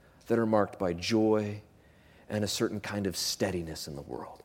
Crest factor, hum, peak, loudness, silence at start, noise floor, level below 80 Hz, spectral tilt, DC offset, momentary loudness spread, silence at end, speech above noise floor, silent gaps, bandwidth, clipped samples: 20 dB; none; -12 dBFS; -31 LUFS; 0.25 s; -59 dBFS; -60 dBFS; -4.5 dB/octave; under 0.1%; 13 LU; 0.1 s; 28 dB; none; 17 kHz; under 0.1%